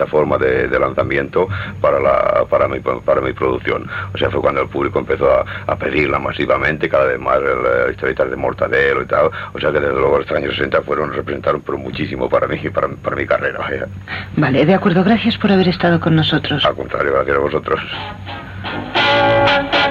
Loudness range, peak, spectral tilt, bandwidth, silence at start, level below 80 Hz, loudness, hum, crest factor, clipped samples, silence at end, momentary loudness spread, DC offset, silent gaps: 4 LU; -2 dBFS; -7.5 dB/octave; 7.4 kHz; 0 s; -38 dBFS; -16 LUFS; none; 14 dB; under 0.1%; 0 s; 8 LU; under 0.1%; none